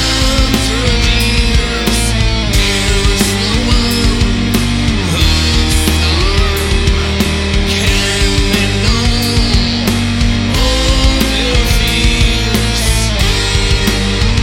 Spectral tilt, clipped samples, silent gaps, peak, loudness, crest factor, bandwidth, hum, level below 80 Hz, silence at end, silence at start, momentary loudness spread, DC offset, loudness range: -4 dB/octave; under 0.1%; none; 0 dBFS; -12 LUFS; 12 dB; 17 kHz; none; -16 dBFS; 0 s; 0 s; 2 LU; under 0.1%; 0 LU